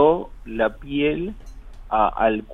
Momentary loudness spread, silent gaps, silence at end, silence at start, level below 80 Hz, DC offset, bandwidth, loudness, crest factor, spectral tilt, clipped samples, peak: 13 LU; none; 0 s; 0 s; -40 dBFS; under 0.1%; 6.4 kHz; -23 LUFS; 18 dB; -7.5 dB/octave; under 0.1%; -4 dBFS